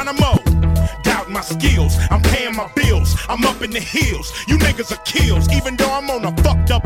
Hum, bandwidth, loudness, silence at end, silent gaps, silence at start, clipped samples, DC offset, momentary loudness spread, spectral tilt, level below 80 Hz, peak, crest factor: none; 16.5 kHz; -17 LUFS; 0 s; none; 0 s; under 0.1%; under 0.1%; 5 LU; -5 dB/octave; -20 dBFS; 0 dBFS; 16 dB